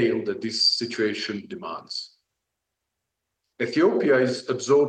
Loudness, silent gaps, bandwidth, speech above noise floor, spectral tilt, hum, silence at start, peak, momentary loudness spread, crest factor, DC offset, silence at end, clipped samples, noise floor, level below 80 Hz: -24 LUFS; none; 9.8 kHz; 59 dB; -4 dB/octave; none; 0 s; -8 dBFS; 13 LU; 18 dB; under 0.1%; 0 s; under 0.1%; -82 dBFS; -74 dBFS